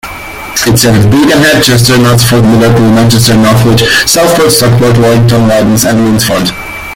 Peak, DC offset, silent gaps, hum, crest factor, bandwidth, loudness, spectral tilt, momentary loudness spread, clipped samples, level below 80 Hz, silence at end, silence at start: 0 dBFS; under 0.1%; none; none; 6 dB; 17 kHz; -5 LUFS; -4.5 dB/octave; 5 LU; 0.5%; -28 dBFS; 0 s; 0.05 s